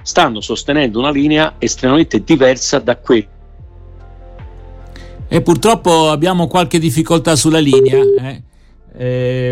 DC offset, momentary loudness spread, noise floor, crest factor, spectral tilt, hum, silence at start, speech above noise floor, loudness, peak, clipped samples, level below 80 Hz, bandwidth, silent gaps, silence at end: under 0.1%; 7 LU; -36 dBFS; 14 dB; -5 dB/octave; none; 0 s; 24 dB; -13 LUFS; 0 dBFS; under 0.1%; -36 dBFS; 16 kHz; none; 0 s